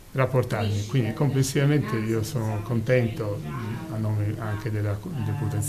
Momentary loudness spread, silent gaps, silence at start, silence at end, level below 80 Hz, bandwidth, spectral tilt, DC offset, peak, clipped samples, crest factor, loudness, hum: 8 LU; none; 0 s; 0 s; -50 dBFS; 15 kHz; -6.5 dB/octave; under 0.1%; -8 dBFS; under 0.1%; 16 dB; -26 LUFS; none